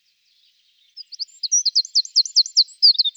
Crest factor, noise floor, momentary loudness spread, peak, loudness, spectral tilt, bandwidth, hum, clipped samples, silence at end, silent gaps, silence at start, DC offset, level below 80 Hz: 16 dB; -61 dBFS; 15 LU; -4 dBFS; -15 LUFS; 10.5 dB/octave; 15.5 kHz; 50 Hz at -95 dBFS; under 0.1%; 0.05 s; none; 0.95 s; under 0.1%; under -90 dBFS